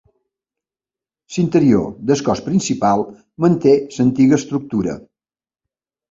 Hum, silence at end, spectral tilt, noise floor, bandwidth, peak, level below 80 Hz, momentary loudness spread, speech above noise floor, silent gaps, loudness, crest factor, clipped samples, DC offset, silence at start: none; 1.1 s; -6.5 dB/octave; under -90 dBFS; 7.8 kHz; 0 dBFS; -50 dBFS; 9 LU; over 74 dB; none; -17 LUFS; 18 dB; under 0.1%; under 0.1%; 1.3 s